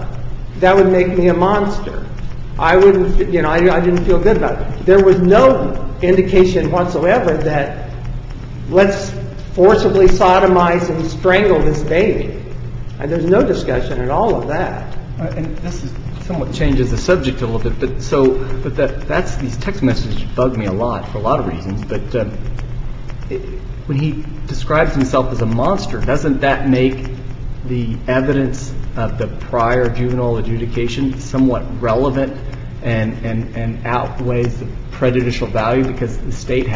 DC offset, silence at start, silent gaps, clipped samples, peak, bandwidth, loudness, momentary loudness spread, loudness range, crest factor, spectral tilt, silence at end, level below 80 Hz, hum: under 0.1%; 0 s; none; under 0.1%; 0 dBFS; 7.6 kHz; -16 LUFS; 17 LU; 7 LU; 14 dB; -7 dB/octave; 0 s; -26 dBFS; none